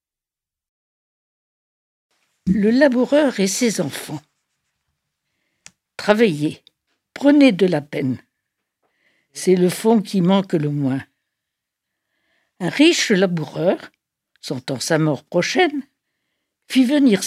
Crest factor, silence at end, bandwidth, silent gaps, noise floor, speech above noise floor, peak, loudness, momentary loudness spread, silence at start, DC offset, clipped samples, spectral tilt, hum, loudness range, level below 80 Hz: 20 dB; 0 s; 15 kHz; none; -89 dBFS; 72 dB; 0 dBFS; -18 LUFS; 14 LU; 2.45 s; under 0.1%; under 0.1%; -5 dB/octave; none; 4 LU; -58 dBFS